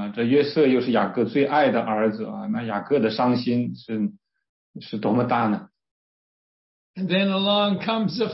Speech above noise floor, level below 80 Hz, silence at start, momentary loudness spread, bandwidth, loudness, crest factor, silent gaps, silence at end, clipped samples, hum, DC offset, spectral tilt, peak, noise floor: over 68 dB; -68 dBFS; 0 s; 10 LU; 5.8 kHz; -22 LUFS; 16 dB; 4.49-4.74 s, 5.91-6.94 s; 0 s; under 0.1%; none; under 0.1%; -10 dB/octave; -8 dBFS; under -90 dBFS